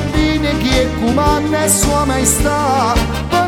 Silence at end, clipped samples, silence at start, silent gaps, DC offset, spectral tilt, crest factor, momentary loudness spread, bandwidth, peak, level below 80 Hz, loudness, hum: 0 s; under 0.1%; 0 s; none; under 0.1%; -4 dB/octave; 14 dB; 3 LU; 18.5 kHz; 0 dBFS; -22 dBFS; -14 LUFS; none